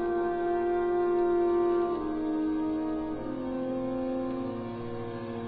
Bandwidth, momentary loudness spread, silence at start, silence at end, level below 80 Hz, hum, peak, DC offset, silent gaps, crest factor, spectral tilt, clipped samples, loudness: 4.7 kHz; 10 LU; 0 s; 0 s; -54 dBFS; none; -18 dBFS; under 0.1%; none; 12 dB; -11 dB/octave; under 0.1%; -30 LUFS